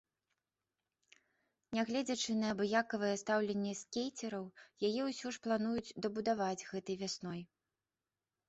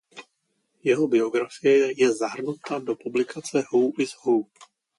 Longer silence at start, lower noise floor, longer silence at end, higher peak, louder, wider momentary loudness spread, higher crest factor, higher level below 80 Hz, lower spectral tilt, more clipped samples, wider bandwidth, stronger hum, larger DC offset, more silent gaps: first, 1.7 s vs 0.15 s; first, under -90 dBFS vs -74 dBFS; first, 1.05 s vs 0.35 s; second, -20 dBFS vs -8 dBFS; second, -38 LUFS vs -24 LUFS; about the same, 9 LU vs 9 LU; about the same, 20 dB vs 16 dB; about the same, -76 dBFS vs -74 dBFS; about the same, -4 dB/octave vs -5 dB/octave; neither; second, 8.2 kHz vs 11.5 kHz; neither; neither; neither